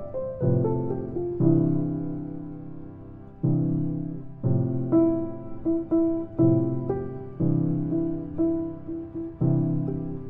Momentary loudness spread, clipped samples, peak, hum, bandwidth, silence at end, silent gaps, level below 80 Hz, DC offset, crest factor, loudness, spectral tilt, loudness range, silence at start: 14 LU; under 0.1%; -8 dBFS; none; 2.4 kHz; 0 s; none; -48 dBFS; under 0.1%; 18 dB; -26 LUFS; -14.5 dB/octave; 2 LU; 0 s